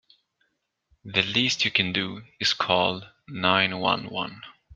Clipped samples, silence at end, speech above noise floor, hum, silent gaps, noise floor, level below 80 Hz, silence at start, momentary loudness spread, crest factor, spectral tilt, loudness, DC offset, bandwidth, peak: under 0.1%; 0.25 s; 48 dB; none; none; -74 dBFS; -64 dBFS; 1.05 s; 12 LU; 24 dB; -3.5 dB/octave; -24 LUFS; under 0.1%; 9.6 kHz; -4 dBFS